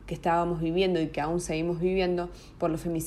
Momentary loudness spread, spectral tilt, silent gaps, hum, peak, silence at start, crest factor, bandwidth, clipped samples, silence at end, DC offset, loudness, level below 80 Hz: 5 LU; -6 dB/octave; none; none; -14 dBFS; 0 s; 14 dB; 14 kHz; under 0.1%; 0 s; under 0.1%; -28 LUFS; -46 dBFS